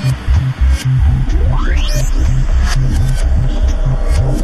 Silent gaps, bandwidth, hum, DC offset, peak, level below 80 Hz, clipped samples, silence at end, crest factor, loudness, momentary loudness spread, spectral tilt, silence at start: none; 13.5 kHz; none; under 0.1%; -2 dBFS; -12 dBFS; under 0.1%; 0 s; 10 dB; -15 LUFS; 3 LU; -6 dB/octave; 0 s